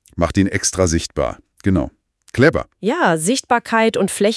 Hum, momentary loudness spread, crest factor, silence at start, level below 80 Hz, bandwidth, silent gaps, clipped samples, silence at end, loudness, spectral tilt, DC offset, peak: none; 8 LU; 18 dB; 0.15 s; -40 dBFS; 12 kHz; none; under 0.1%; 0 s; -18 LUFS; -4.5 dB/octave; under 0.1%; 0 dBFS